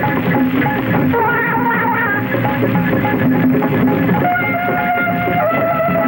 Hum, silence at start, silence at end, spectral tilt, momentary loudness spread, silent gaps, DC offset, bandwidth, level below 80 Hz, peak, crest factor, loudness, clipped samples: none; 0 s; 0 s; -9 dB/octave; 2 LU; none; under 0.1%; 17 kHz; -44 dBFS; -2 dBFS; 12 dB; -15 LUFS; under 0.1%